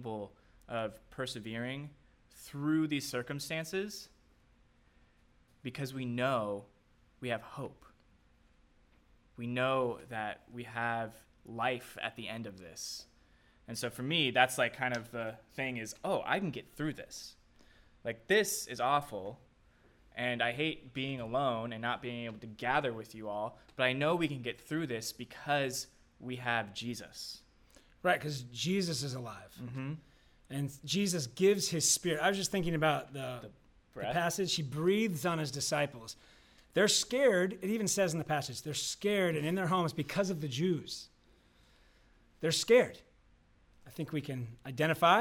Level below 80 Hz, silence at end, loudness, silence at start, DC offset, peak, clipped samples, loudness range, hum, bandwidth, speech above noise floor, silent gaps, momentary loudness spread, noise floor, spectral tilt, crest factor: -66 dBFS; 0 s; -34 LUFS; 0 s; under 0.1%; -10 dBFS; under 0.1%; 8 LU; none; 17 kHz; 33 dB; none; 16 LU; -67 dBFS; -4 dB/octave; 24 dB